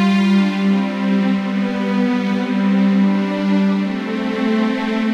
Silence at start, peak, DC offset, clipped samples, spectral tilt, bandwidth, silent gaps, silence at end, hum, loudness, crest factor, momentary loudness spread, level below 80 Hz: 0 s; -6 dBFS; under 0.1%; under 0.1%; -7.5 dB/octave; 7.8 kHz; none; 0 s; none; -17 LUFS; 10 dB; 5 LU; -60 dBFS